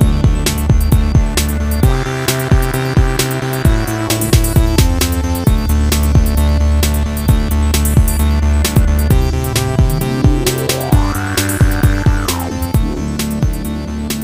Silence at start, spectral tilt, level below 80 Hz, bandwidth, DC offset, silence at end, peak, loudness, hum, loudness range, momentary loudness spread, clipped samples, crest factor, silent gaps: 0 s; -5.5 dB/octave; -16 dBFS; 16.5 kHz; under 0.1%; 0 s; 0 dBFS; -14 LUFS; none; 1 LU; 4 LU; under 0.1%; 12 dB; none